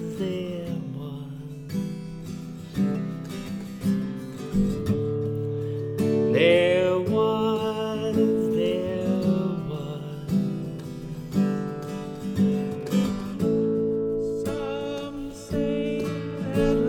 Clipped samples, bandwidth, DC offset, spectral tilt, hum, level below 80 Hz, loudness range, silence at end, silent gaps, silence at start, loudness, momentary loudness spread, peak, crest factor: under 0.1%; 16.5 kHz; under 0.1%; -7 dB/octave; none; -48 dBFS; 8 LU; 0 s; none; 0 s; -26 LUFS; 12 LU; -8 dBFS; 18 dB